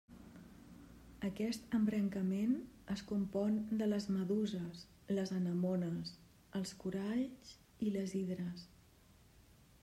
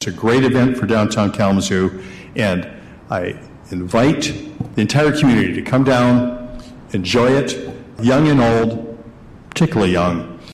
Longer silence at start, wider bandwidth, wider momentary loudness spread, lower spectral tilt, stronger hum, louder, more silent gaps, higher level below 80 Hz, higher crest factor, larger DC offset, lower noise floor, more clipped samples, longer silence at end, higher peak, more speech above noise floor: about the same, 0.1 s vs 0 s; about the same, 14 kHz vs 13.5 kHz; first, 21 LU vs 15 LU; about the same, -7 dB/octave vs -6 dB/octave; neither; second, -39 LUFS vs -16 LUFS; neither; second, -68 dBFS vs -42 dBFS; about the same, 14 dB vs 12 dB; neither; first, -65 dBFS vs -39 dBFS; neither; first, 1.15 s vs 0 s; second, -24 dBFS vs -4 dBFS; first, 27 dB vs 23 dB